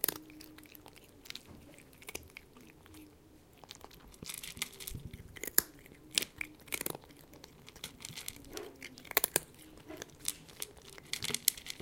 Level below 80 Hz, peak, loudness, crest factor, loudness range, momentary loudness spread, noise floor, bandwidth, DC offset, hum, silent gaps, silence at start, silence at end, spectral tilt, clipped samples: -62 dBFS; -2 dBFS; -37 LUFS; 40 dB; 14 LU; 24 LU; -60 dBFS; 17 kHz; under 0.1%; none; none; 0 s; 0 s; -1 dB/octave; under 0.1%